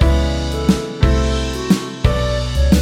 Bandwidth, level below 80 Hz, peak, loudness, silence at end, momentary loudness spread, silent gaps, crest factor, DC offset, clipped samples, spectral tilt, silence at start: 15.5 kHz; -18 dBFS; 0 dBFS; -18 LUFS; 0 s; 4 LU; none; 14 dB; under 0.1%; under 0.1%; -6 dB/octave; 0 s